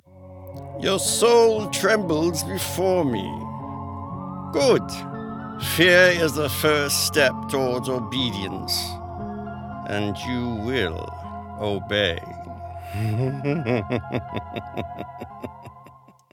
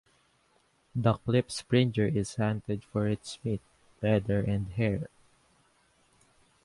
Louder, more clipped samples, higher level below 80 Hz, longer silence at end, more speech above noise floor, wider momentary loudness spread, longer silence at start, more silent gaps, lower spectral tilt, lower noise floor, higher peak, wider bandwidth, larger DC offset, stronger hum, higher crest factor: first, -23 LUFS vs -30 LUFS; neither; about the same, -50 dBFS vs -54 dBFS; second, 0.4 s vs 1.55 s; second, 27 dB vs 40 dB; first, 18 LU vs 9 LU; second, 0.15 s vs 0.95 s; neither; second, -4 dB/octave vs -6.5 dB/octave; second, -50 dBFS vs -69 dBFS; first, -2 dBFS vs -10 dBFS; first, 19 kHz vs 11.5 kHz; neither; neither; about the same, 20 dB vs 22 dB